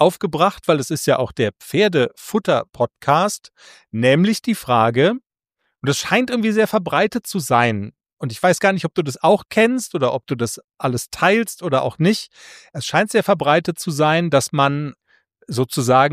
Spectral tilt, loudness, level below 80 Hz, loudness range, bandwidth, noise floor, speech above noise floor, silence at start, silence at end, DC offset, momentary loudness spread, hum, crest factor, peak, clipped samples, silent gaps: -5 dB/octave; -18 LUFS; -58 dBFS; 1 LU; 15.5 kHz; -74 dBFS; 55 dB; 0 s; 0 s; under 0.1%; 9 LU; none; 18 dB; 0 dBFS; under 0.1%; 8.13-8.17 s, 10.64-10.68 s